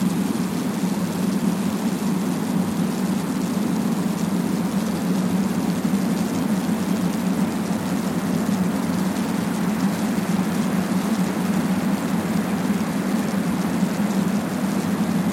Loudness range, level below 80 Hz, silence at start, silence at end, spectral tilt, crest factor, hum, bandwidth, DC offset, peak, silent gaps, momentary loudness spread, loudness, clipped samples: 1 LU; -54 dBFS; 0 s; 0 s; -6 dB/octave; 14 dB; none; 16.5 kHz; under 0.1%; -8 dBFS; none; 2 LU; -23 LUFS; under 0.1%